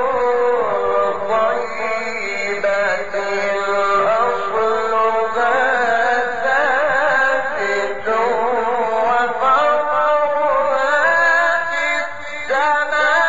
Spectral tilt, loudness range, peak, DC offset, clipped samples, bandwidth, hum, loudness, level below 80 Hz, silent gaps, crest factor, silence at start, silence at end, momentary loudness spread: 0 dB/octave; 3 LU; -4 dBFS; 3%; under 0.1%; 7.8 kHz; none; -17 LUFS; -54 dBFS; none; 12 dB; 0 s; 0 s; 6 LU